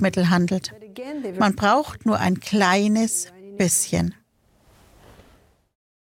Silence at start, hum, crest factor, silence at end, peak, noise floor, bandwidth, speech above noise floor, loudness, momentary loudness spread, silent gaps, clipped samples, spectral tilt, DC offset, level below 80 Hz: 0 s; none; 20 dB; 2.05 s; -4 dBFS; -60 dBFS; 17 kHz; 39 dB; -21 LUFS; 13 LU; none; under 0.1%; -4.5 dB/octave; under 0.1%; -52 dBFS